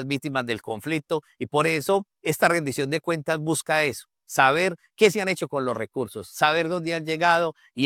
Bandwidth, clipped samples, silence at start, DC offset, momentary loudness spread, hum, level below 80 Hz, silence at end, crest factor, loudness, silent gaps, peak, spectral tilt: 17.5 kHz; under 0.1%; 0 s; under 0.1%; 9 LU; none; -66 dBFS; 0 s; 20 dB; -24 LUFS; none; -4 dBFS; -4 dB/octave